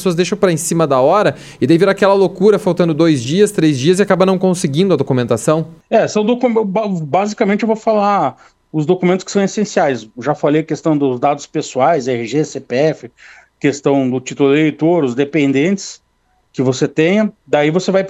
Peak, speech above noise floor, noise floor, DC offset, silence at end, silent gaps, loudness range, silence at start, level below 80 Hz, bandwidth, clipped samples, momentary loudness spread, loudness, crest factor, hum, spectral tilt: 0 dBFS; 46 dB; -60 dBFS; under 0.1%; 0 s; none; 4 LU; 0 s; -56 dBFS; 14.5 kHz; under 0.1%; 6 LU; -14 LUFS; 14 dB; none; -6 dB/octave